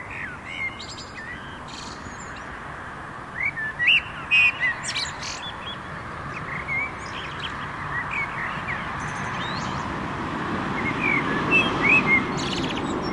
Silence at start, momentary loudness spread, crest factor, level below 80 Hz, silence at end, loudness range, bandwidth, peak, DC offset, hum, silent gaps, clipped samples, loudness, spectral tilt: 0 s; 18 LU; 18 dB; -48 dBFS; 0 s; 8 LU; 11.5 kHz; -8 dBFS; under 0.1%; none; none; under 0.1%; -23 LUFS; -4 dB/octave